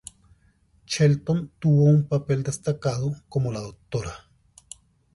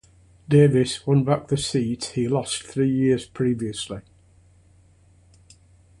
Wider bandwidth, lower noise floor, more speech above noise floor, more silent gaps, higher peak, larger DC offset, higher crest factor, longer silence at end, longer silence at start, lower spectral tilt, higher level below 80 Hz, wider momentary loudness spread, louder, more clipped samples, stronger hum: about the same, 11.5 kHz vs 11.5 kHz; first, -61 dBFS vs -55 dBFS; first, 39 dB vs 34 dB; neither; second, -8 dBFS vs -4 dBFS; neither; about the same, 16 dB vs 20 dB; second, 0.95 s vs 2 s; first, 0.9 s vs 0.5 s; about the same, -7 dB/octave vs -6 dB/octave; about the same, -52 dBFS vs -54 dBFS; first, 25 LU vs 11 LU; about the same, -24 LUFS vs -22 LUFS; neither; neither